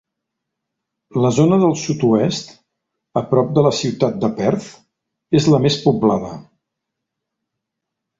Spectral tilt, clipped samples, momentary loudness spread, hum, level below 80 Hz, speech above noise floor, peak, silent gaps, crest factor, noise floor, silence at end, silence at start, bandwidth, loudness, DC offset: -6.5 dB/octave; under 0.1%; 11 LU; none; -54 dBFS; 64 dB; -2 dBFS; none; 16 dB; -80 dBFS; 1.8 s; 1.15 s; 7.8 kHz; -17 LUFS; under 0.1%